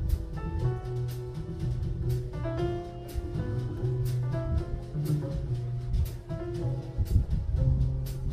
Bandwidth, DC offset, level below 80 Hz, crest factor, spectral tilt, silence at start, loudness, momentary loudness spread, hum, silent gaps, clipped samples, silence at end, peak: 15.5 kHz; under 0.1%; -34 dBFS; 18 dB; -8.5 dB/octave; 0 s; -32 LUFS; 7 LU; none; none; under 0.1%; 0 s; -10 dBFS